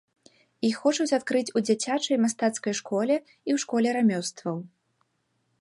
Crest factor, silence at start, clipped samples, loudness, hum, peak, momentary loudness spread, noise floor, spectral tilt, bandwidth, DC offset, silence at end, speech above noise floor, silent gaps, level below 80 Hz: 18 dB; 0.6 s; under 0.1%; -26 LUFS; none; -10 dBFS; 7 LU; -74 dBFS; -4 dB/octave; 11.5 kHz; under 0.1%; 0.95 s; 48 dB; none; -78 dBFS